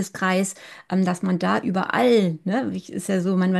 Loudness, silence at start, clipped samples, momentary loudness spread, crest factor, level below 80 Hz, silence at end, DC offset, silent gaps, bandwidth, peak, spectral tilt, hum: -22 LUFS; 0 s; under 0.1%; 10 LU; 14 dB; -66 dBFS; 0 s; under 0.1%; none; 12.5 kHz; -6 dBFS; -6 dB/octave; none